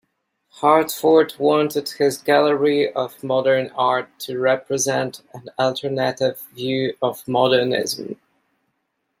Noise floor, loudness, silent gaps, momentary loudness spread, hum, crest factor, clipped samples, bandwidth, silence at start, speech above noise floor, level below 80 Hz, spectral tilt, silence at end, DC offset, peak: -73 dBFS; -20 LUFS; none; 11 LU; none; 18 dB; under 0.1%; 16.5 kHz; 0.55 s; 54 dB; -68 dBFS; -4 dB/octave; 1.05 s; under 0.1%; -2 dBFS